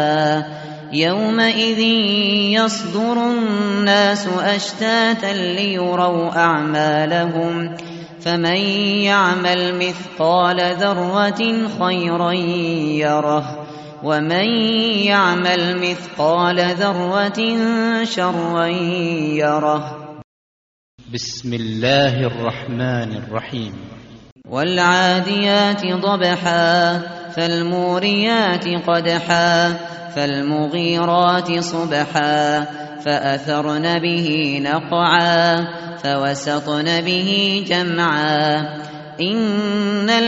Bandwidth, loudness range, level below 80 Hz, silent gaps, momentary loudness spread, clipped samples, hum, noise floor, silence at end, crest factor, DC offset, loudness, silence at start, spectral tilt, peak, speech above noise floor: 8 kHz; 4 LU; -58 dBFS; 20.24-20.98 s, 24.32-24.36 s; 10 LU; under 0.1%; none; under -90 dBFS; 0 s; 18 dB; under 0.1%; -17 LUFS; 0 s; -3 dB/octave; 0 dBFS; over 73 dB